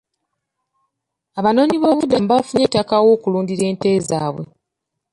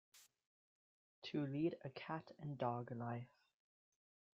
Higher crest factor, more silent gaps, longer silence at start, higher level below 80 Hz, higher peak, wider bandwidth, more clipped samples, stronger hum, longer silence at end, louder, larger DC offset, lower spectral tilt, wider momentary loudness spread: second, 16 dB vs 22 dB; second, none vs 0.46-1.22 s; first, 1.35 s vs 0.15 s; first, -54 dBFS vs -84 dBFS; first, -2 dBFS vs -28 dBFS; first, 11.5 kHz vs 7.4 kHz; neither; neither; second, 0.65 s vs 1.1 s; first, -17 LUFS vs -46 LUFS; neither; about the same, -6 dB/octave vs -6 dB/octave; about the same, 10 LU vs 10 LU